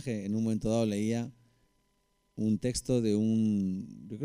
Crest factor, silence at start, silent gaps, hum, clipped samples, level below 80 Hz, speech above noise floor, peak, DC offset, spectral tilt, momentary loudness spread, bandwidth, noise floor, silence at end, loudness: 14 dB; 0 s; none; none; under 0.1%; -56 dBFS; 44 dB; -18 dBFS; under 0.1%; -6.5 dB/octave; 11 LU; 12.5 kHz; -74 dBFS; 0 s; -31 LUFS